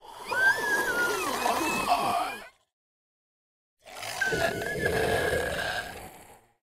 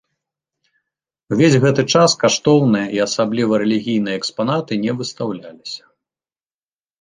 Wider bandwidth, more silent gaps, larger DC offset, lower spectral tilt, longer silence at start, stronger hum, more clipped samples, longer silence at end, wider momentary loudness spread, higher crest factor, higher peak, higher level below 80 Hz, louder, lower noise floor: first, 16 kHz vs 9.8 kHz; first, 2.73-3.77 s vs none; neither; second, -3 dB/octave vs -5 dB/octave; second, 0.05 s vs 1.3 s; neither; neither; second, 0.3 s vs 1.25 s; about the same, 15 LU vs 14 LU; about the same, 18 dB vs 18 dB; second, -12 dBFS vs -2 dBFS; first, -52 dBFS vs -58 dBFS; second, -27 LUFS vs -17 LUFS; second, -53 dBFS vs under -90 dBFS